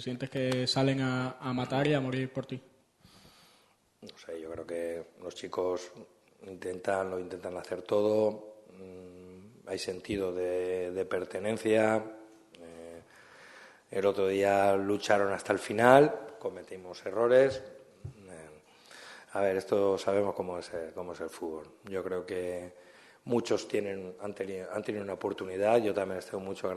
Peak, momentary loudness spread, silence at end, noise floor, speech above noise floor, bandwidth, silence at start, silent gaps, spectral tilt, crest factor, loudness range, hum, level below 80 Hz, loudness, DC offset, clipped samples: -6 dBFS; 22 LU; 0 s; -67 dBFS; 36 dB; 12.5 kHz; 0 s; none; -5.5 dB/octave; 26 dB; 10 LU; none; -70 dBFS; -31 LUFS; under 0.1%; under 0.1%